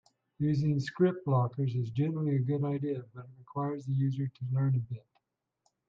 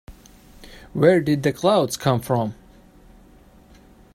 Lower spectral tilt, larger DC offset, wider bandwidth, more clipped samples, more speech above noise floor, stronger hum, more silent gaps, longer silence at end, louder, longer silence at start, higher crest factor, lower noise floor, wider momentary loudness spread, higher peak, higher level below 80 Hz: first, -9.5 dB/octave vs -6 dB/octave; neither; second, 7.2 kHz vs 16 kHz; neither; first, 48 dB vs 31 dB; neither; neither; second, 0.9 s vs 1.6 s; second, -32 LUFS vs -20 LUFS; first, 0.4 s vs 0.1 s; about the same, 16 dB vs 20 dB; first, -79 dBFS vs -50 dBFS; first, 11 LU vs 8 LU; second, -14 dBFS vs -2 dBFS; second, -68 dBFS vs -50 dBFS